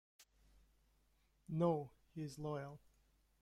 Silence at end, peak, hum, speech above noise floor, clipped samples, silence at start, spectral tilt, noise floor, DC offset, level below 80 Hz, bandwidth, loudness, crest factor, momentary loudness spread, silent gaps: 0.65 s; -24 dBFS; none; 35 dB; under 0.1%; 0.2 s; -8 dB/octave; -77 dBFS; under 0.1%; -72 dBFS; 14 kHz; -43 LUFS; 20 dB; 16 LU; none